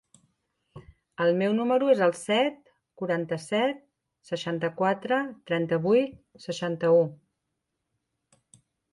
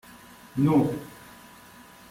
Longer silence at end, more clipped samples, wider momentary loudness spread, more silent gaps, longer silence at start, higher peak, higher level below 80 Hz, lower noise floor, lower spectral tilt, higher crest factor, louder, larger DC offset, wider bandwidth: first, 1.75 s vs 1 s; neither; second, 12 LU vs 26 LU; neither; first, 0.75 s vs 0.55 s; about the same, -10 dBFS vs -10 dBFS; second, -68 dBFS vs -58 dBFS; first, -82 dBFS vs -50 dBFS; second, -6 dB/octave vs -8 dB/octave; about the same, 18 dB vs 18 dB; about the same, -26 LUFS vs -25 LUFS; neither; second, 11.5 kHz vs 16 kHz